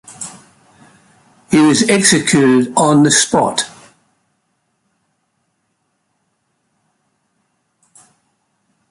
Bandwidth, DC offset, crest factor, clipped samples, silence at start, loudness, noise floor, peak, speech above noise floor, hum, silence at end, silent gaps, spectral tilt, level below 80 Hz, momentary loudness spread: 11.5 kHz; under 0.1%; 18 dB; under 0.1%; 0.1 s; -12 LUFS; -67 dBFS; 0 dBFS; 55 dB; none; 5.25 s; none; -3.5 dB/octave; -54 dBFS; 17 LU